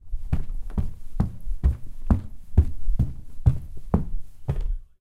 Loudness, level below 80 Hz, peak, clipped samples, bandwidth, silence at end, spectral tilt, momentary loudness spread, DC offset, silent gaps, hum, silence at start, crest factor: -28 LUFS; -26 dBFS; -4 dBFS; under 0.1%; 3.6 kHz; 0.15 s; -10 dB/octave; 11 LU; under 0.1%; none; none; 0.05 s; 18 dB